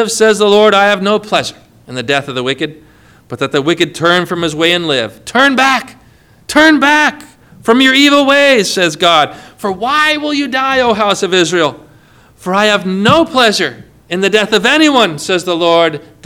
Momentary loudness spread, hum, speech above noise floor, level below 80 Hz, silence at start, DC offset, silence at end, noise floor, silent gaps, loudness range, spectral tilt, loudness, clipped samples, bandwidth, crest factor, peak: 10 LU; none; 34 dB; -48 dBFS; 0 s; under 0.1%; 0.25 s; -45 dBFS; none; 5 LU; -3.5 dB/octave; -10 LUFS; 0.3%; 19 kHz; 12 dB; 0 dBFS